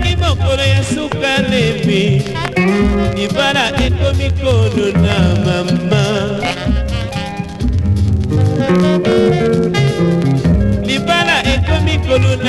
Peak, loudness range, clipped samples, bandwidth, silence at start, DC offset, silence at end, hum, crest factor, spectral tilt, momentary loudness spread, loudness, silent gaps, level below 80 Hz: 0 dBFS; 2 LU; under 0.1%; 12.5 kHz; 0 s; under 0.1%; 0 s; none; 14 dB; -6 dB/octave; 5 LU; -14 LUFS; none; -22 dBFS